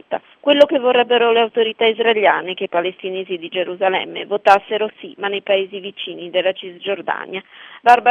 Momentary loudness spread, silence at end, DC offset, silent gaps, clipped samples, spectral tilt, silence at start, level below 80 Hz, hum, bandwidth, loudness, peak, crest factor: 13 LU; 0 s; under 0.1%; none; under 0.1%; -4.5 dB/octave; 0.1 s; -68 dBFS; none; 10 kHz; -18 LUFS; 0 dBFS; 18 dB